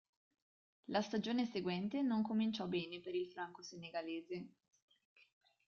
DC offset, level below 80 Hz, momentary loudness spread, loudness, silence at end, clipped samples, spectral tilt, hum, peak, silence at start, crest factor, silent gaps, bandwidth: under 0.1%; -82 dBFS; 12 LU; -41 LUFS; 1.2 s; under 0.1%; -6 dB/octave; none; -26 dBFS; 0.9 s; 16 dB; none; 7 kHz